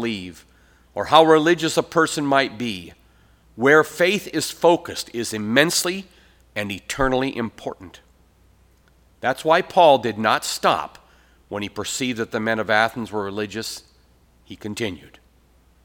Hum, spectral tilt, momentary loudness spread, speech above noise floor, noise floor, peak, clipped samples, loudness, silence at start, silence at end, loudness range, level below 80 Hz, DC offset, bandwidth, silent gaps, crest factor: none; -3.5 dB/octave; 17 LU; 36 dB; -56 dBFS; 0 dBFS; under 0.1%; -20 LUFS; 0 s; 0.9 s; 6 LU; -50 dBFS; under 0.1%; 19.5 kHz; none; 22 dB